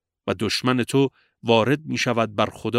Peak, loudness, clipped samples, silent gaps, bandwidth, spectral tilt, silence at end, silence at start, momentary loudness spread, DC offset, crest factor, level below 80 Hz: -2 dBFS; -22 LUFS; under 0.1%; none; 15.5 kHz; -5 dB/octave; 0 s; 0.25 s; 7 LU; under 0.1%; 20 dB; -60 dBFS